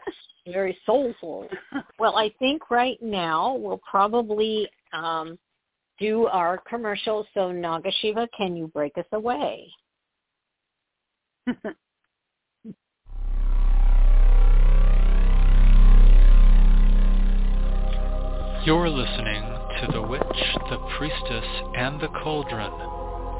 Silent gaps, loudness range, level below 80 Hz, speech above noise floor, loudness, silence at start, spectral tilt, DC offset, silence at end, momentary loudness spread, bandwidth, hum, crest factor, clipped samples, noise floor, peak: none; 11 LU; -22 dBFS; 56 dB; -25 LUFS; 0.05 s; -9.5 dB/octave; under 0.1%; 0 s; 12 LU; 4 kHz; none; 14 dB; under 0.1%; -81 dBFS; -6 dBFS